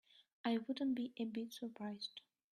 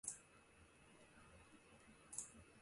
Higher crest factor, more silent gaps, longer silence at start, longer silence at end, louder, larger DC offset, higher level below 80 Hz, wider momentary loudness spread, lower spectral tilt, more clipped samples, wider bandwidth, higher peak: second, 20 dB vs 30 dB; first, 0.33-0.44 s vs none; about the same, 0.15 s vs 0.05 s; first, 0.35 s vs 0 s; first, -43 LUFS vs -57 LUFS; neither; second, -86 dBFS vs -78 dBFS; second, 8 LU vs 16 LU; first, -5 dB/octave vs -2 dB/octave; neither; first, 13.5 kHz vs 11.5 kHz; first, -24 dBFS vs -28 dBFS